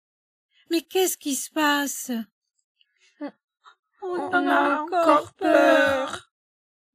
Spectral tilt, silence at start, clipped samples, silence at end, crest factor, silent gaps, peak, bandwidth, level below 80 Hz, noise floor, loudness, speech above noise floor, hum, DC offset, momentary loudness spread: -2 dB/octave; 0.7 s; under 0.1%; 0.75 s; 20 dB; 2.32-2.42 s, 2.64-2.75 s, 3.44-3.48 s, 3.79-3.83 s; -4 dBFS; 15.5 kHz; -70 dBFS; -42 dBFS; -22 LUFS; 19 dB; none; under 0.1%; 20 LU